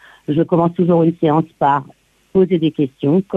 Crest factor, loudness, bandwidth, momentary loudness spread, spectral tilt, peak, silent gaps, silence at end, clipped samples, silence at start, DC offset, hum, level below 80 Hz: 14 dB; -16 LUFS; 4 kHz; 5 LU; -10 dB/octave; -2 dBFS; none; 0 s; under 0.1%; 0.3 s; under 0.1%; none; -54 dBFS